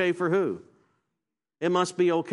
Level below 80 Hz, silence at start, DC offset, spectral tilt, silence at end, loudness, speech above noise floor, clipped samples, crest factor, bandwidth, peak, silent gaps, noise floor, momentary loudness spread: -76 dBFS; 0 s; under 0.1%; -5.5 dB/octave; 0 s; -26 LUFS; 61 dB; under 0.1%; 16 dB; 11.5 kHz; -10 dBFS; none; -86 dBFS; 8 LU